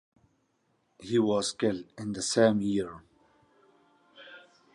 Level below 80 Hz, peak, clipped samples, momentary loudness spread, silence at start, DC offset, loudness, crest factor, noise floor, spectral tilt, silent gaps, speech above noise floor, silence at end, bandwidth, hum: -66 dBFS; -10 dBFS; under 0.1%; 25 LU; 1 s; under 0.1%; -28 LUFS; 20 dB; -73 dBFS; -4.5 dB/octave; none; 45 dB; 0.35 s; 11.5 kHz; none